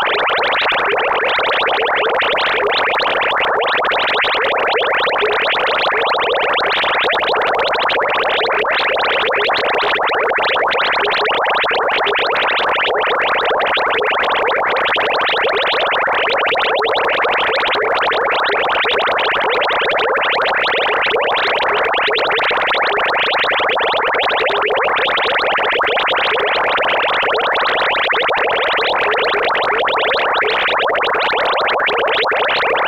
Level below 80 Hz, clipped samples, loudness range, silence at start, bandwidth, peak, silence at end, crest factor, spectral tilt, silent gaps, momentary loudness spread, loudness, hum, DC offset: -50 dBFS; under 0.1%; 0 LU; 0 s; 15.5 kHz; -4 dBFS; 0 s; 12 dB; -3 dB/octave; none; 1 LU; -14 LUFS; none; under 0.1%